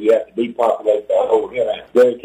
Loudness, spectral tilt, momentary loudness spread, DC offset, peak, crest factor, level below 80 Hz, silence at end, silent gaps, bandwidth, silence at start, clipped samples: -17 LUFS; -5.5 dB/octave; 6 LU; under 0.1%; -2 dBFS; 14 dB; -60 dBFS; 0.05 s; none; 10 kHz; 0 s; under 0.1%